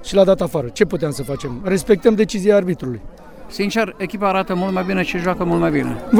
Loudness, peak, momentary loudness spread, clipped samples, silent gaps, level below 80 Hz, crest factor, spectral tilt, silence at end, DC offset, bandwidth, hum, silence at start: -18 LUFS; 0 dBFS; 10 LU; under 0.1%; none; -40 dBFS; 18 dB; -6 dB/octave; 0 s; under 0.1%; 17.5 kHz; none; 0 s